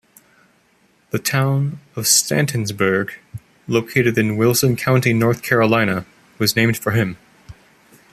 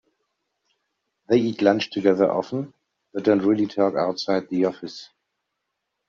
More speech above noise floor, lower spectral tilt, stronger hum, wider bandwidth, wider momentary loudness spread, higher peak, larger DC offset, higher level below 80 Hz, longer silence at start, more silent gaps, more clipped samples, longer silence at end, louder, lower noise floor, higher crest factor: second, 41 dB vs 58 dB; about the same, -4.5 dB/octave vs -5 dB/octave; neither; first, 15 kHz vs 7.2 kHz; second, 11 LU vs 16 LU; first, 0 dBFS vs -4 dBFS; neither; first, -52 dBFS vs -68 dBFS; second, 1.15 s vs 1.3 s; neither; neither; second, 0.6 s vs 1.05 s; first, -18 LUFS vs -22 LUFS; second, -58 dBFS vs -79 dBFS; about the same, 18 dB vs 20 dB